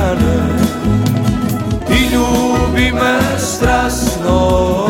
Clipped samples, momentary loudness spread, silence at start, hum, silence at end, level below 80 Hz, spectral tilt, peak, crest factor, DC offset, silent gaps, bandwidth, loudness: under 0.1%; 3 LU; 0 s; none; 0 s; -22 dBFS; -5.5 dB/octave; 0 dBFS; 12 dB; under 0.1%; none; 17 kHz; -14 LUFS